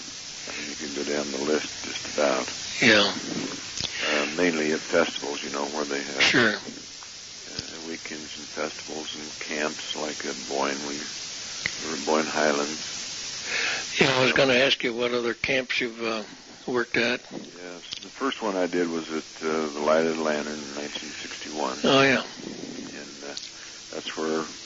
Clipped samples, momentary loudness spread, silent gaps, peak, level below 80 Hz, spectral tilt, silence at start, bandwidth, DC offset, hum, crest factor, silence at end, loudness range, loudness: under 0.1%; 16 LU; none; -6 dBFS; -62 dBFS; -2.5 dB/octave; 0 s; 8 kHz; under 0.1%; none; 22 dB; 0 s; 7 LU; -26 LUFS